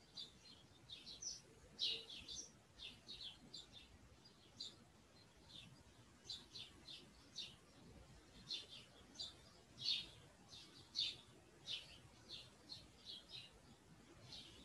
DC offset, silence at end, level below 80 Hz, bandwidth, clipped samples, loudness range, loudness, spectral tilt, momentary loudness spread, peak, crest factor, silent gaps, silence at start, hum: under 0.1%; 0 s; -74 dBFS; 12 kHz; under 0.1%; 9 LU; -50 LUFS; -1 dB/octave; 22 LU; -28 dBFS; 26 dB; none; 0 s; none